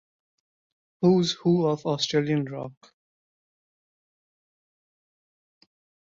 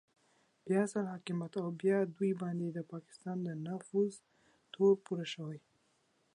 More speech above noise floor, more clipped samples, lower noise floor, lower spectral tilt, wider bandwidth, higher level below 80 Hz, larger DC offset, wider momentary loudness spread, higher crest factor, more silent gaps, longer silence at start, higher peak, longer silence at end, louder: first, over 66 dB vs 40 dB; neither; first, under -90 dBFS vs -75 dBFS; about the same, -6 dB/octave vs -7 dB/octave; second, 7.8 kHz vs 11 kHz; first, -70 dBFS vs -86 dBFS; neither; about the same, 13 LU vs 15 LU; about the same, 20 dB vs 18 dB; neither; first, 1 s vs 0.65 s; first, -10 dBFS vs -18 dBFS; first, 3.4 s vs 0.8 s; first, -24 LUFS vs -36 LUFS